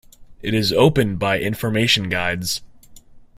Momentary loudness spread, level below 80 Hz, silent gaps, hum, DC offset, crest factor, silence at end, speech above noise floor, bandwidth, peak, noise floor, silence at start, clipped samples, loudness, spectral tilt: 9 LU; -44 dBFS; none; none; under 0.1%; 18 dB; 0.15 s; 24 dB; 16 kHz; -2 dBFS; -43 dBFS; 0.2 s; under 0.1%; -19 LUFS; -4.5 dB/octave